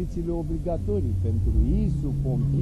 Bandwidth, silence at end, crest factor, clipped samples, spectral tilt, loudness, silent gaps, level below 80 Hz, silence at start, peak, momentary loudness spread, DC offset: 10 kHz; 0 s; 12 dB; under 0.1%; -10.5 dB/octave; -26 LUFS; none; -28 dBFS; 0 s; -12 dBFS; 5 LU; under 0.1%